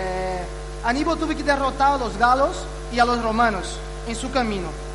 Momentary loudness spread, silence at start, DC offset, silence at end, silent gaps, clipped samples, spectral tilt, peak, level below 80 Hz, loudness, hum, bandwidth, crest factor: 11 LU; 0 s; under 0.1%; 0 s; none; under 0.1%; -4.5 dB/octave; -6 dBFS; -34 dBFS; -22 LUFS; 50 Hz at -35 dBFS; 11.5 kHz; 16 dB